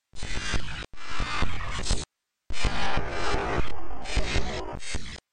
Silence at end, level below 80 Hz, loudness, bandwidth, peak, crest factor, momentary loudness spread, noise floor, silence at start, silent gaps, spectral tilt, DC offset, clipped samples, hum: 0.15 s; -34 dBFS; -32 LUFS; 10 kHz; -10 dBFS; 12 dB; 9 LU; -44 dBFS; 0.15 s; none; -4 dB/octave; under 0.1%; under 0.1%; none